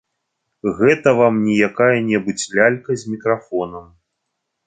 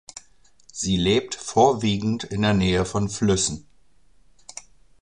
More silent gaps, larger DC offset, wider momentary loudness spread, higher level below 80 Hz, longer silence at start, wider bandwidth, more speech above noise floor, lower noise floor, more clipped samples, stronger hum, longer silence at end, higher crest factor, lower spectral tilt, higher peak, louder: neither; second, under 0.1% vs 0.2%; second, 11 LU vs 21 LU; second, -56 dBFS vs -44 dBFS; first, 0.65 s vs 0.15 s; second, 9.6 kHz vs 11 kHz; first, 59 dB vs 40 dB; first, -76 dBFS vs -61 dBFS; neither; neither; second, 0.85 s vs 1.45 s; about the same, 16 dB vs 20 dB; about the same, -5.5 dB/octave vs -4.5 dB/octave; about the same, -2 dBFS vs -4 dBFS; first, -17 LUFS vs -22 LUFS